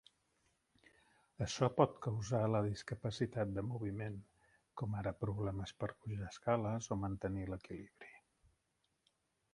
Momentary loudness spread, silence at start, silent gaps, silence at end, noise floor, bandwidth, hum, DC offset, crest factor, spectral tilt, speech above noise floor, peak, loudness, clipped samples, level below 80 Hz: 14 LU; 1.4 s; none; 1.35 s; -83 dBFS; 11 kHz; none; under 0.1%; 26 dB; -6.5 dB/octave; 44 dB; -16 dBFS; -40 LUFS; under 0.1%; -62 dBFS